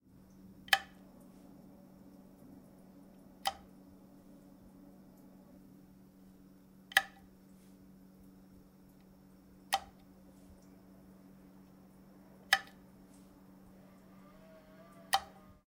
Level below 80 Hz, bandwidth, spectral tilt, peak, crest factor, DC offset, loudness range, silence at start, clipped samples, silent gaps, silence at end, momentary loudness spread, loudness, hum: -70 dBFS; 16 kHz; -1 dB/octave; -8 dBFS; 36 dB; under 0.1%; 9 LU; 0.05 s; under 0.1%; none; 0.1 s; 28 LU; -34 LUFS; none